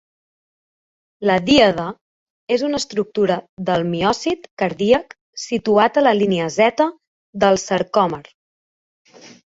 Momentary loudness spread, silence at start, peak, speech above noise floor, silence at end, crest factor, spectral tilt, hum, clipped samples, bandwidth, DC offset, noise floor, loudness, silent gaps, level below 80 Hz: 10 LU; 1.2 s; -2 dBFS; over 73 dB; 0.3 s; 18 dB; -5 dB/octave; none; under 0.1%; 8 kHz; under 0.1%; under -90 dBFS; -18 LUFS; 2.01-2.47 s, 3.49-3.57 s, 4.51-4.57 s, 5.21-5.33 s, 7.07-7.33 s, 8.34-9.05 s; -54 dBFS